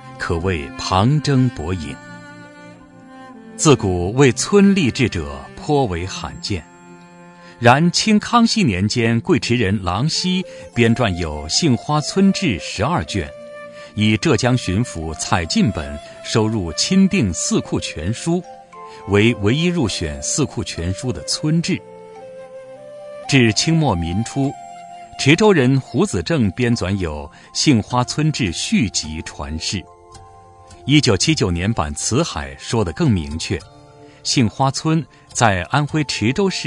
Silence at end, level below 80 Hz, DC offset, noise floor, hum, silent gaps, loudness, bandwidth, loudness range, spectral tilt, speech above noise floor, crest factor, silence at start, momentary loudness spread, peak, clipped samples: 0 s; -42 dBFS; under 0.1%; -43 dBFS; none; none; -18 LUFS; 11 kHz; 4 LU; -5 dB/octave; 26 dB; 18 dB; 0 s; 17 LU; 0 dBFS; under 0.1%